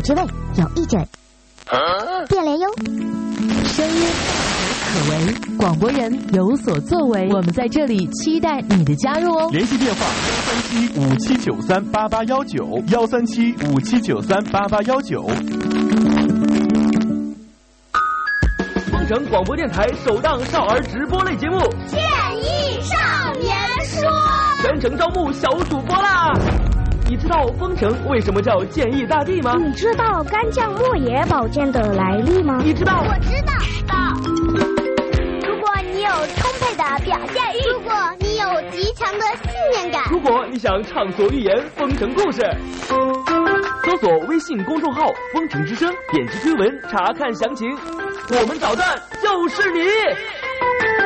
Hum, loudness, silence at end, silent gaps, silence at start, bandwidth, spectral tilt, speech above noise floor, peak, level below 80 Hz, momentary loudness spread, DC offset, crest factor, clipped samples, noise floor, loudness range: none; -19 LUFS; 0 s; none; 0 s; 8.8 kHz; -5.5 dB/octave; 30 dB; -4 dBFS; -30 dBFS; 5 LU; under 0.1%; 14 dB; under 0.1%; -49 dBFS; 2 LU